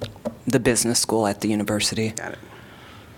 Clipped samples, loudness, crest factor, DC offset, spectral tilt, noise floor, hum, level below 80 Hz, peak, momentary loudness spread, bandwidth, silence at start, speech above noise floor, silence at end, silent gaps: under 0.1%; -22 LUFS; 20 dB; under 0.1%; -3.5 dB/octave; -44 dBFS; none; -50 dBFS; -4 dBFS; 15 LU; 18 kHz; 0 s; 22 dB; 0 s; none